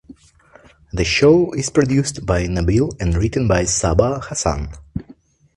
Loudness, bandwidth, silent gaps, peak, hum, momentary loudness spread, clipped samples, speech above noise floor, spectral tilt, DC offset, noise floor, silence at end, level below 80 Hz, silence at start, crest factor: -17 LUFS; 11.5 kHz; none; 0 dBFS; none; 15 LU; under 0.1%; 33 dB; -5 dB/octave; under 0.1%; -49 dBFS; 0.55 s; -30 dBFS; 0.1 s; 18 dB